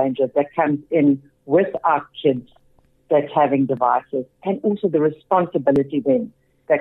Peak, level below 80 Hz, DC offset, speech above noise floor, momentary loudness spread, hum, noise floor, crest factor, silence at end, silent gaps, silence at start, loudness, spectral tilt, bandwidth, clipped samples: -6 dBFS; -60 dBFS; under 0.1%; 38 dB; 5 LU; none; -57 dBFS; 14 dB; 0 s; none; 0 s; -20 LUFS; -9.5 dB/octave; 4.1 kHz; under 0.1%